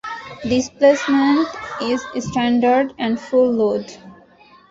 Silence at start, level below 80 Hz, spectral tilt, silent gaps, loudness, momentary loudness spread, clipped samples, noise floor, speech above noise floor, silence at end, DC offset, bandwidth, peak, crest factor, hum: 0.05 s; -52 dBFS; -5 dB/octave; none; -18 LUFS; 10 LU; under 0.1%; -49 dBFS; 31 dB; 0.6 s; under 0.1%; 7.8 kHz; -2 dBFS; 16 dB; none